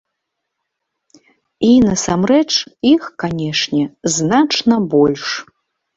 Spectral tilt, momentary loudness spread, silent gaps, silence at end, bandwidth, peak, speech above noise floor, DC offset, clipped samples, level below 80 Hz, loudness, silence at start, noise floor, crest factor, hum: -4.5 dB/octave; 9 LU; none; 0.55 s; 8 kHz; -2 dBFS; 62 dB; under 0.1%; under 0.1%; -48 dBFS; -15 LUFS; 1.6 s; -76 dBFS; 16 dB; none